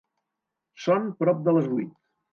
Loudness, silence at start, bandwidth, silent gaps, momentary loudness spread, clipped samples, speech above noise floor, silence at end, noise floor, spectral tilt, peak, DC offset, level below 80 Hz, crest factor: -25 LUFS; 0.8 s; 7 kHz; none; 9 LU; under 0.1%; 61 dB; 0.45 s; -84 dBFS; -8 dB/octave; -10 dBFS; under 0.1%; -78 dBFS; 18 dB